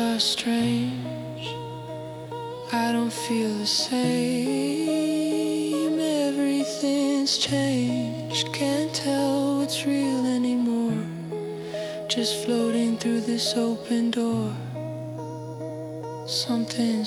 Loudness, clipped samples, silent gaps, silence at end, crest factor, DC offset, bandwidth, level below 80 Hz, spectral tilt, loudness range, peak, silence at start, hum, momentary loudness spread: -25 LUFS; under 0.1%; none; 0 s; 18 dB; under 0.1%; 14.5 kHz; -64 dBFS; -4.5 dB/octave; 4 LU; -8 dBFS; 0 s; none; 12 LU